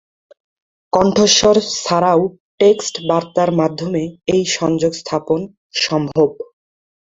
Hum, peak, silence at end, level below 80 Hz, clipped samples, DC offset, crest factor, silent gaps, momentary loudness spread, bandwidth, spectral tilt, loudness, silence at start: none; 0 dBFS; 0.75 s; -50 dBFS; under 0.1%; under 0.1%; 16 dB; 2.40-2.58 s, 5.57-5.70 s; 10 LU; 8 kHz; -4 dB/octave; -16 LUFS; 0.95 s